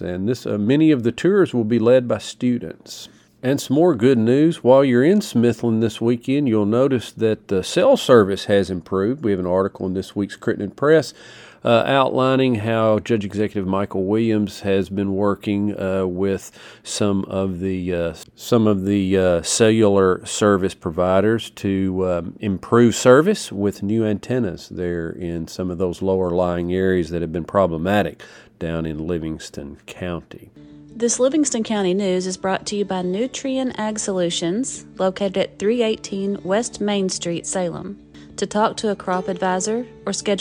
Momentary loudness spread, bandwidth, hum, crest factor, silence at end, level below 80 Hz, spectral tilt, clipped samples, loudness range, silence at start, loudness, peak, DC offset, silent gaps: 11 LU; 19 kHz; none; 18 dB; 0 s; -50 dBFS; -5.5 dB/octave; under 0.1%; 5 LU; 0 s; -20 LUFS; 0 dBFS; under 0.1%; none